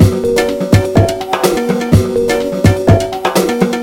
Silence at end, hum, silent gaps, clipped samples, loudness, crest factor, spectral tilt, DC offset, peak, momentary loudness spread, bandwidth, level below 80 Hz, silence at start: 0 s; none; none; 0.6%; -13 LUFS; 12 dB; -6 dB/octave; under 0.1%; 0 dBFS; 4 LU; 16.5 kHz; -28 dBFS; 0 s